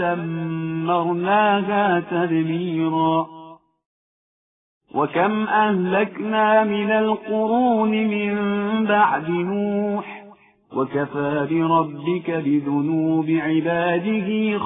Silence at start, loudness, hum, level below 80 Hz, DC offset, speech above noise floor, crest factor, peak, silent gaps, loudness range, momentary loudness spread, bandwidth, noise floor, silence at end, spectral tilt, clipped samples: 0 s; -21 LUFS; none; -64 dBFS; under 0.1%; 28 dB; 16 dB; -6 dBFS; 3.86-4.81 s; 4 LU; 7 LU; 3.9 kHz; -48 dBFS; 0 s; -11.5 dB/octave; under 0.1%